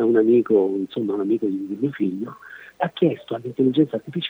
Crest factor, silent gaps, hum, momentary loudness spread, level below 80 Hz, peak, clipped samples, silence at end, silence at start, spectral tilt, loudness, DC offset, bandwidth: 16 dB; none; none; 13 LU; -72 dBFS; -6 dBFS; under 0.1%; 0 s; 0 s; -8.5 dB/octave; -22 LUFS; under 0.1%; over 20 kHz